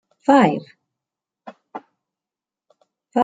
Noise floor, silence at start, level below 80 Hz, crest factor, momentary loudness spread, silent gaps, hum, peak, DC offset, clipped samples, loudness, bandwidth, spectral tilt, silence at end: -89 dBFS; 0.3 s; -70 dBFS; 20 dB; 24 LU; none; none; -2 dBFS; under 0.1%; under 0.1%; -17 LUFS; 9.2 kHz; -6.5 dB/octave; 0 s